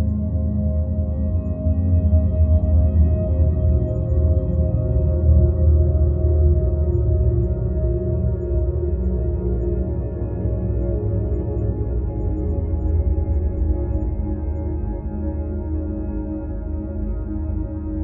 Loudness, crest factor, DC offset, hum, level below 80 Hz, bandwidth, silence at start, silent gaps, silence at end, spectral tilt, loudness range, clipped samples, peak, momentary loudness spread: -21 LUFS; 14 dB; under 0.1%; none; -24 dBFS; 1.9 kHz; 0 s; none; 0 s; -14.5 dB/octave; 7 LU; under 0.1%; -4 dBFS; 9 LU